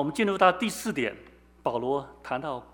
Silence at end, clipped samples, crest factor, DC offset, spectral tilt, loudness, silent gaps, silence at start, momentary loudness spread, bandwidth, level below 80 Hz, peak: 0.1 s; under 0.1%; 22 dB; under 0.1%; -4.5 dB/octave; -28 LUFS; none; 0 s; 11 LU; over 20 kHz; -60 dBFS; -6 dBFS